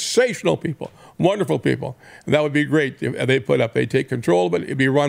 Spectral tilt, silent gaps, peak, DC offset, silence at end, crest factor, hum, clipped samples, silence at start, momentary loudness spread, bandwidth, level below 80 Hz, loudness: -5.5 dB/octave; none; -2 dBFS; under 0.1%; 0 s; 18 dB; none; under 0.1%; 0 s; 9 LU; 16 kHz; -58 dBFS; -20 LUFS